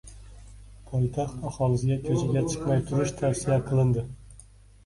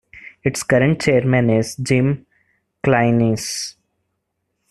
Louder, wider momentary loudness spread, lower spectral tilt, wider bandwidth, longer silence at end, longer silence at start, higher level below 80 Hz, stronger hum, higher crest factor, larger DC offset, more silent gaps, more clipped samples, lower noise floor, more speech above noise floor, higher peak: second, -27 LUFS vs -18 LUFS; about the same, 8 LU vs 9 LU; about the same, -7 dB/octave vs -6 dB/octave; second, 11.5 kHz vs 13 kHz; second, 0.45 s vs 1 s; about the same, 0.05 s vs 0.15 s; about the same, -46 dBFS vs -48 dBFS; first, 50 Hz at -45 dBFS vs none; about the same, 14 dB vs 16 dB; neither; neither; neither; second, -52 dBFS vs -74 dBFS; second, 26 dB vs 57 dB; second, -12 dBFS vs -2 dBFS